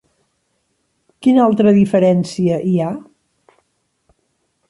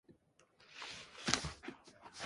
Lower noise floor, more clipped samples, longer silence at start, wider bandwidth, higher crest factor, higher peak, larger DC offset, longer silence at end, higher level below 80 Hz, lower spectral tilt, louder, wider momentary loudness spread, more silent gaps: second, -67 dBFS vs -71 dBFS; neither; first, 1.2 s vs 0.1 s; about the same, 11.5 kHz vs 11.5 kHz; second, 14 dB vs 36 dB; first, -2 dBFS vs -10 dBFS; neither; first, 1.7 s vs 0 s; about the same, -58 dBFS vs -62 dBFS; first, -8 dB/octave vs -2 dB/octave; first, -14 LUFS vs -41 LUFS; second, 7 LU vs 20 LU; neither